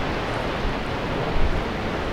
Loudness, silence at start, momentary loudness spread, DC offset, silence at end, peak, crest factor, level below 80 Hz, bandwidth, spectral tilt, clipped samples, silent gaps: -26 LUFS; 0 s; 2 LU; under 0.1%; 0 s; -8 dBFS; 16 dB; -28 dBFS; 11 kHz; -6 dB/octave; under 0.1%; none